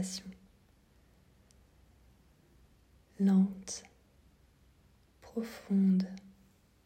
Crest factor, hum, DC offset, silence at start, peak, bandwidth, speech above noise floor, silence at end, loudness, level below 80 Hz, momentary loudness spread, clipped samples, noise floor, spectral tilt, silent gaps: 18 dB; none; under 0.1%; 0 s; -20 dBFS; 10 kHz; 35 dB; 0.65 s; -32 LUFS; -68 dBFS; 16 LU; under 0.1%; -65 dBFS; -6.5 dB/octave; none